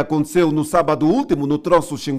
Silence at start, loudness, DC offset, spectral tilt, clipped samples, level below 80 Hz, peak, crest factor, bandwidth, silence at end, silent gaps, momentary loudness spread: 0 s; -17 LUFS; under 0.1%; -6.5 dB/octave; under 0.1%; -46 dBFS; 0 dBFS; 16 dB; 15.5 kHz; 0 s; none; 2 LU